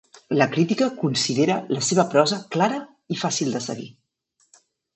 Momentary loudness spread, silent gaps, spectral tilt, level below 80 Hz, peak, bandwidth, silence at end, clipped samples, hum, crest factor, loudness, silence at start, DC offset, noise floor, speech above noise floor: 12 LU; none; -4.5 dB/octave; -70 dBFS; -4 dBFS; 8.6 kHz; 1.05 s; under 0.1%; none; 20 dB; -22 LUFS; 0.3 s; under 0.1%; -68 dBFS; 46 dB